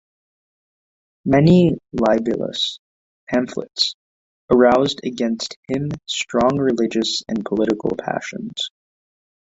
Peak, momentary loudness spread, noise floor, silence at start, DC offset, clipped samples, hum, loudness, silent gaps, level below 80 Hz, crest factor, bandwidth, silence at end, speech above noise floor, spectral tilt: -2 dBFS; 12 LU; under -90 dBFS; 1.25 s; under 0.1%; under 0.1%; none; -19 LUFS; 2.79-3.27 s, 3.94-4.48 s, 5.56-5.63 s; -50 dBFS; 18 dB; 8 kHz; 0.8 s; over 71 dB; -5.5 dB/octave